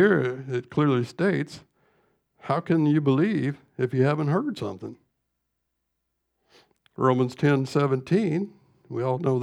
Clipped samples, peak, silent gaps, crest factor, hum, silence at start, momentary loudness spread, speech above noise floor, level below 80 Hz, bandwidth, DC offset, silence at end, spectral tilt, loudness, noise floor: under 0.1%; -8 dBFS; none; 18 dB; none; 0 s; 13 LU; 55 dB; -70 dBFS; 11 kHz; under 0.1%; 0 s; -8 dB/octave; -25 LUFS; -79 dBFS